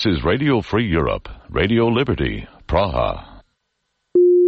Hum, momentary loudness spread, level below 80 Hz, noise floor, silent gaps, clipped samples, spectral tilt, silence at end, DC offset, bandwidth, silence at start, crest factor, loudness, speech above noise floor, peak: none; 10 LU; -34 dBFS; -73 dBFS; none; under 0.1%; -8 dB/octave; 0 s; under 0.1%; 6.4 kHz; 0 s; 14 dB; -19 LUFS; 54 dB; -4 dBFS